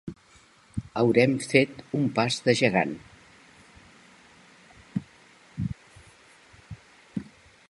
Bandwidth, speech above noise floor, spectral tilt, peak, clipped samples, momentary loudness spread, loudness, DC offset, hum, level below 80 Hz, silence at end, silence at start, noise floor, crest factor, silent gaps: 11.5 kHz; 34 dB; -5.5 dB/octave; -4 dBFS; under 0.1%; 22 LU; -26 LUFS; under 0.1%; none; -56 dBFS; 0.45 s; 0.05 s; -57 dBFS; 26 dB; none